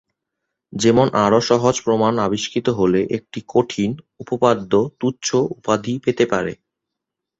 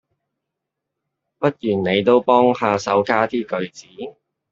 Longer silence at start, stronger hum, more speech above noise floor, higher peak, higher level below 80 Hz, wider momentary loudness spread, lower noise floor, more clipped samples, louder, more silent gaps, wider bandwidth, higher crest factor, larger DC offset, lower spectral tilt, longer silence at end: second, 0.7 s vs 1.4 s; neither; about the same, 64 dB vs 63 dB; about the same, -2 dBFS vs -2 dBFS; first, -54 dBFS vs -62 dBFS; second, 9 LU vs 19 LU; about the same, -82 dBFS vs -81 dBFS; neither; about the same, -19 LUFS vs -18 LUFS; neither; about the same, 8.2 kHz vs 7.6 kHz; about the same, 18 dB vs 18 dB; neither; about the same, -5.5 dB/octave vs -6 dB/octave; first, 0.85 s vs 0.4 s